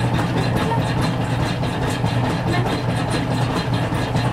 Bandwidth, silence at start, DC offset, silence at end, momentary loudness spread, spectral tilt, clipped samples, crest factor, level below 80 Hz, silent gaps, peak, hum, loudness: 14 kHz; 0 s; under 0.1%; 0 s; 2 LU; -6.5 dB/octave; under 0.1%; 12 dB; -36 dBFS; none; -6 dBFS; none; -21 LUFS